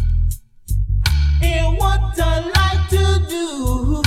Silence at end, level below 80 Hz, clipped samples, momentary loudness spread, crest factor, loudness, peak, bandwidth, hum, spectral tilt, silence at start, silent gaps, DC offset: 0 s; -18 dBFS; under 0.1%; 7 LU; 16 dB; -18 LUFS; 0 dBFS; 15.5 kHz; none; -5.5 dB/octave; 0 s; none; under 0.1%